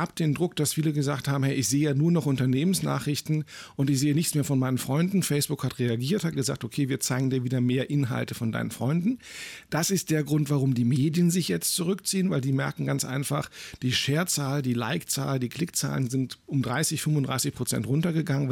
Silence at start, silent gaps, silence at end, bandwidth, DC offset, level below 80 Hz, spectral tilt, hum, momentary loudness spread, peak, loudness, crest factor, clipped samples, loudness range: 0 s; none; 0 s; 18 kHz; under 0.1%; -60 dBFS; -5 dB/octave; none; 6 LU; -14 dBFS; -26 LUFS; 12 dB; under 0.1%; 2 LU